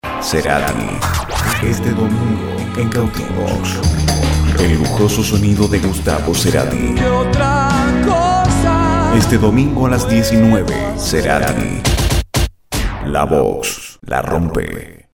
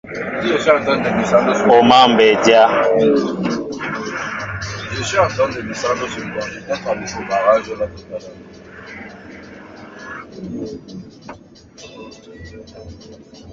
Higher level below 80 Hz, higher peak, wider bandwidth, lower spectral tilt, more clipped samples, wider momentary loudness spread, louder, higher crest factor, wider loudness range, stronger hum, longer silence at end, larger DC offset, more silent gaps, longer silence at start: first, -24 dBFS vs -46 dBFS; about the same, 0 dBFS vs 0 dBFS; first, 19 kHz vs 7.8 kHz; about the same, -5.5 dB/octave vs -4.5 dB/octave; neither; second, 7 LU vs 26 LU; about the same, -15 LUFS vs -16 LUFS; about the same, 14 dB vs 18 dB; second, 4 LU vs 21 LU; neither; first, 0.2 s vs 0 s; neither; neither; about the same, 0.05 s vs 0.05 s